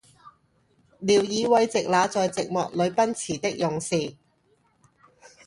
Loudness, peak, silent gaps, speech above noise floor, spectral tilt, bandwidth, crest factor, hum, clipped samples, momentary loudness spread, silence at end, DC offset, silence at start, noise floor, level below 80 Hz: -24 LUFS; -8 dBFS; none; 42 dB; -4 dB/octave; 11.5 kHz; 18 dB; none; under 0.1%; 7 LU; 1.35 s; under 0.1%; 0.25 s; -66 dBFS; -64 dBFS